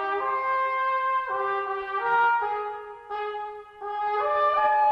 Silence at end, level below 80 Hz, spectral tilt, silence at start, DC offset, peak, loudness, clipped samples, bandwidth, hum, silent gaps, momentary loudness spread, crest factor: 0 s; -66 dBFS; -4 dB/octave; 0 s; under 0.1%; -12 dBFS; -26 LUFS; under 0.1%; 6.2 kHz; none; none; 13 LU; 14 dB